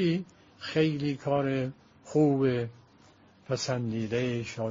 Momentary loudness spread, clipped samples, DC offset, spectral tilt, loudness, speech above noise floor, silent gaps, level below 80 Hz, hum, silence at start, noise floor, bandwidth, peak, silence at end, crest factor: 11 LU; under 0.1%; under 0.1%; -6 dB/octave; -30 LUFS; 30 dB; none; -64 dBFS; none; 0 s; -58 dBFS; 7.4 kHz; -12 dBFS; 0 s; 18 dB